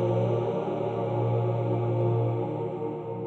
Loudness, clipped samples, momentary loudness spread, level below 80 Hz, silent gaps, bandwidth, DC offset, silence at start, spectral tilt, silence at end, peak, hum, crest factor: -28 LUFS; under 0.1%; 6 LU; -62 dBFS; none; 4.2 kHz; under 0.1%; 0 s; -10.5 dB/octave; 0 s; -14 dBFS; none; 12 dB